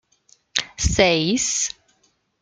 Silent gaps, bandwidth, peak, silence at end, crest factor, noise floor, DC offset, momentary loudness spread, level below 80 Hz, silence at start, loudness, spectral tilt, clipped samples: none; 10.5 kHz; -2 dBFS; 0.7 s; 22 dB; -65 dBFS; under 0.1%; 9 LU; -36 dBFS; 0.55 s; -20 LUFS; -3 dB/octave; under 0.1%